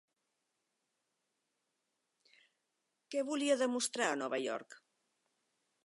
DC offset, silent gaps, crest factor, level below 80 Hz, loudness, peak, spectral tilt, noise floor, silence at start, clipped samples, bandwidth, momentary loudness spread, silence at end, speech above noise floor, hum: under 0.1%; none; 22 dB; under -90 dBFS; -36 LUFS; -18 dBFS; -2 dB/octave; -85 dBFS; 3.1 s; under 0.1%; 11.5 kHz; 9 LU; 1.1 s; 50 dB; none